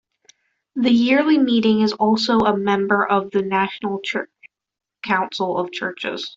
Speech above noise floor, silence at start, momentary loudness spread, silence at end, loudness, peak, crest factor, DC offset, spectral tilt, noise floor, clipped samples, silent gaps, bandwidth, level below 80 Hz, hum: 38 dB; 0.75 s; 10 LU; 0.05 s; -19 LUFS; -4 dBFS; 16 dB; under 0.1%; -5.5 dB/octave; -57 dBFS; under 0.1%; none; 7.6 kHz; -60 dBFS; none